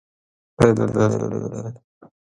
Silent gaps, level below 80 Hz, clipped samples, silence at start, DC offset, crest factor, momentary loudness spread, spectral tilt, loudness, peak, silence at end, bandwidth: none; -48 dBFS; under 0.1%; 0.6 s; under 0.1%; 22 dB; 15 LU; -7.5 dB/octave; -20 LUFS; 0 dBFS; 0.5 s; 11.5 kHz